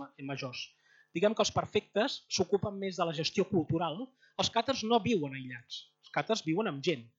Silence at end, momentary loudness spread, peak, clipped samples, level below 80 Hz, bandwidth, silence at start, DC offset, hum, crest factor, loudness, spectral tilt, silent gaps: 0.1 s; 14 LU; -14 dBFS; under 0.1%; -66 dBFS; 8 kHz; 0 s; under 0.1%; none; 18 dB; -33 LUFS; -4.5 dB/octave; none